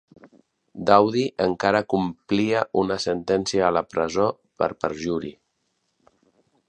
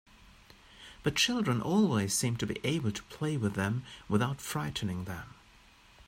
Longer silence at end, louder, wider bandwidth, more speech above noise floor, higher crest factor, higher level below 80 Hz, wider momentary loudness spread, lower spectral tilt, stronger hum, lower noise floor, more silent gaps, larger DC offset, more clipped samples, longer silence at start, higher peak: first, 1.35 s vs 0.75 s; first, -23 LUFS vs -32 LUFS; second, 9.8 kHz vs 16 kHz; first, 51 dB vs 28 dB; about the same, 22 dB vs 18 dB; about the same, -56 dBFS vs -58 dBFS; about the same, 10 LU vs 12 LU; about the same, -5.5 dB/octave vs -4.5 dB/octave; neither; first, -73 dBFS vs -59 dBFS; neither; neither; neither; about the same, 0.75 s vs 0.75 s; first, 0 dBFS vs -14 dBFS